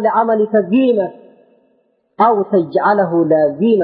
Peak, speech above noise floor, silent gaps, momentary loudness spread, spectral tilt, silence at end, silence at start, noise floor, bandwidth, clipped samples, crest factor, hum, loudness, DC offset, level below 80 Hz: -2 dBFS; 47 dB; none; 2 LU; -12.5 dB/octave; 0 s; 0 s; -60 dBFS; 5 kHz; under 0.1%; 12 dB; none; -14 LUFS; under 0.1%; -68 dBFS